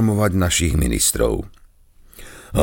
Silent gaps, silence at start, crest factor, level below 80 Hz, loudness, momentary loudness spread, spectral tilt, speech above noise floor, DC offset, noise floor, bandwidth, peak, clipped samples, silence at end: none; 0 s; 18 dB; -30 dBFS; -19 LUFS; 16 LU; -4.5 dB/octave; 31 dB; under 0.1%; -49 dBFS; 17 kHz; -2 dBFS; under 0.1%; 0 s